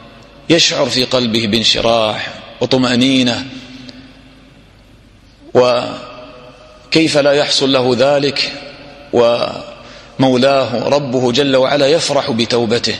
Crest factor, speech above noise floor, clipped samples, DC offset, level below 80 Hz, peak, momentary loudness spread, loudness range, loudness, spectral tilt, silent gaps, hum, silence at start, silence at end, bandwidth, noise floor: 14 dB; 31 dB; under 0.1%; under 0.1%; -46 dBFS; 0 dBFS; 18 LU; 5 LU; -13 LUFS; -4 dB/octave; none; none; 0 s; 0 s; 12.5 kHz; -43 dBFS